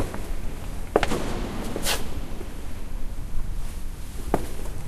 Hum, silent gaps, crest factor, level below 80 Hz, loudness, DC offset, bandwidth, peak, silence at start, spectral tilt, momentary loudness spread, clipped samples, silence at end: none; none; 24 dB; -30 dBFS; -31 LUFS; under 0.1%; 15.5 kHz; -2 dBFS; 0 s; -4.5 dB/octave; 12 LU; under 0.1%; 0 s